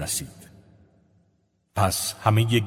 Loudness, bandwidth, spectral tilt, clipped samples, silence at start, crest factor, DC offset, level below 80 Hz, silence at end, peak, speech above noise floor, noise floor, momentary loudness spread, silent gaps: -24 LUFS; 16 kHz; -4.5 dB/octave; under 0.1%; 0 s; 24 dB; under 0.1%; -46 dBFS; 0 s; -2 dBFS; 45 dB; -68 dBFS; 12 LU; none